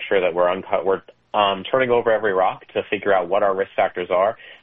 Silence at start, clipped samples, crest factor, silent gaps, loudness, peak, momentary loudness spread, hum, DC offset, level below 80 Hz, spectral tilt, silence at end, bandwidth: 0 s; under 0.1%; 18 dB; none; -20 LUFS; -2 dBFS; 6 LU; none; under 0.1%; -58 dBFS; -2 dB/octave; 0.1 s; 3.9 kHz